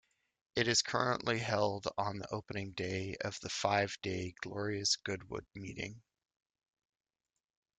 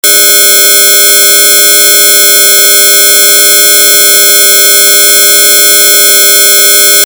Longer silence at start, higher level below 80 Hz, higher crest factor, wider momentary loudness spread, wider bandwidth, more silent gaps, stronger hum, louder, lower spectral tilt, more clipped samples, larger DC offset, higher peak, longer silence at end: first, 0.55 s vs 0.05 s; about the same, -68 dBFS vs -64 dBFS; first, 22 dB vs 4 dB; first, 12 LU vs 0 LU; second, 10 kHz vs over 20 kHz; neither; neither; second, -36 LUFS vs 0 LUFS; first, -3.5 dB/octave vs 4 dB/octave; second, under 0.1% vs 6%; neither; second, -16 dBFS vs 0 dBFS; first, 1.8 s vs 0.05 s